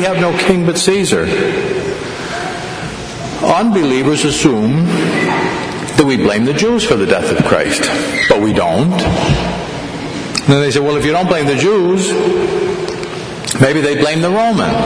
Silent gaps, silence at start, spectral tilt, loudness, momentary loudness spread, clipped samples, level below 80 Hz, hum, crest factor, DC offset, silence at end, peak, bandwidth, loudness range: none; 0 s; -5 dB/octave; -13 LUFS; 10 LU; 0.1%; -36 dBFS; none; 14 dB; under 0.1%; 0 s; 0 dBFS; 11 kHz; 3 LU